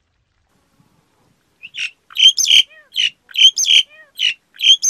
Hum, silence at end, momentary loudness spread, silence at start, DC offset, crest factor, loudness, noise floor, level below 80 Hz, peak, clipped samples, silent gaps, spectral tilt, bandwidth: none; 0 s; 16 LU; 1.65 s; under 0.1%; 16 dB; -12 LUFS; -64 dBFS; -68 dBFS; 0 dBFS; under 0.1%; none; 5.5 dB/octave; 16 kHz